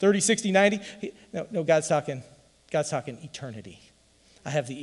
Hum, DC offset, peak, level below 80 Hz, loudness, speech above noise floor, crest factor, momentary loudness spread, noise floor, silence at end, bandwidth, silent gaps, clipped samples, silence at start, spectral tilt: none; under 0.1%; -8 dBFS; -68 dBFS; -26 LUFS; 33 dB; 18 dB; 18 LU; -60 dBFS; 0 s; 12 kHz; none; under 0.1%; 0 s; -4 dB/octave